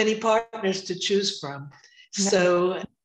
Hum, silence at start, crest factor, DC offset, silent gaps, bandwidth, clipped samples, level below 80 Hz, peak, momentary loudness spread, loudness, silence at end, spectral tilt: none; 0 s; 16 dB; under 0.1%; none; 11 kHz; under 0.1%; -68 dBFS; -8 dBFS; 14 LU; -24 LUFS; 0.2 s; -3.5 dB/octave